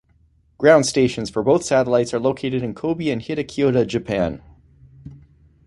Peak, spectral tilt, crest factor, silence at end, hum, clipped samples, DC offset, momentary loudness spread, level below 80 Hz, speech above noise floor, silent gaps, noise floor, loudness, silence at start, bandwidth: -2 dBFS; -5.5 dB/octave; 18 dB; 0.5 s; none; under 0.1%; under 0.1%; 10 LU; -48 dBFS; 39 dB; none; -58 dBFS; -19 LUFS; 0.6 s; 11.5 kHz